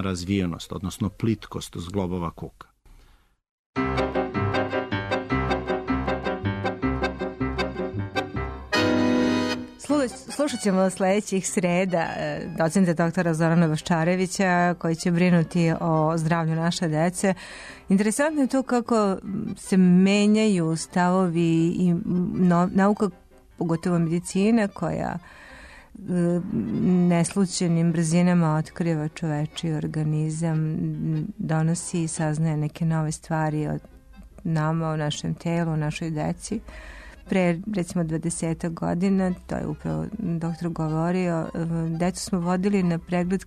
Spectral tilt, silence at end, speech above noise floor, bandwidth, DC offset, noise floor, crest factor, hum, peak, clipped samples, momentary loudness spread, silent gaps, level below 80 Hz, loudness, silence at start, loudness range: -6 dB/octave; 0 s; 33 dB; 13 kHz; under 0.1%; -57 dBFS; 14 dB; none; -10 dBFS; under 0.1%; 9 LU; 3.51-3.73 s; -46 dBFS; -24 LUFS; 0 s; 6 LU